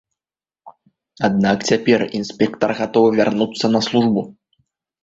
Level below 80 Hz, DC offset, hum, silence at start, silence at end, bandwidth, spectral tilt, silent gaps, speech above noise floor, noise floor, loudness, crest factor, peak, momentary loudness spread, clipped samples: -56 dBFS; under 0.1%; none; 0.65 s; 0.7 s; 7.8 kHz; -5.5 dB/octave; none; over 73 dB; under -90 dBFS; -18 LUFS; 18 dB; -2 dBFS; 6 LU; under 0.1%